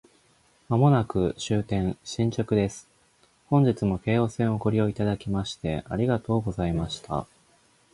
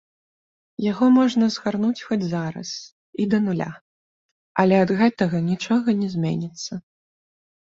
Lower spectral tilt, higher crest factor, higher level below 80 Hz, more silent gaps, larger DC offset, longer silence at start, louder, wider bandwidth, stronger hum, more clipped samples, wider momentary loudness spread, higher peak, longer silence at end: about the same, -7 dB/octave vs -6.5 dB/octave; about the same, 20 dB vs 18 dB; first, -46 dBFS vs -62 dBFS; second, none vs 2.92-3.13 s, 3.81-4.55 s; neither; about the same, 0.7 s vs 0.8 s; second, -26 LUFS vs -21 LUFS; first, 11.5 kHz vs 7.8 kHz; neither; neither; second, 9 LU vs 15 LU; about the same, -6 dBFS vs -4 dBFS; second, 0.7 s vs 0.95 s